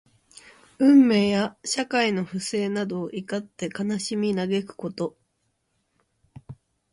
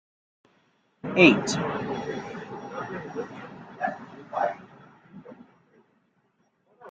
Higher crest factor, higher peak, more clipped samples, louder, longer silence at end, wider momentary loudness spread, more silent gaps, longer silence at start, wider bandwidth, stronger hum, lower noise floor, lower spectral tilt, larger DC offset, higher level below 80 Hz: second, 18 dB vs 26 dB; second, -8 dBFS vs -2 dBFS; neither; about the same, -24 LUFS vs -26 LUFS; first, 0.4 s vs 0 s; second, 15 LU vs 25 LU; neither; second, 0.8 s vs 1.05 s; first, 11.5 kHz vs 9.2 kHz; neither; first, -73 dBFS vs -69 dBFS; about the same, -5 dB/octave vs -5 dB/octave; neither; about the same, -64 dBFS vs -66 dBFS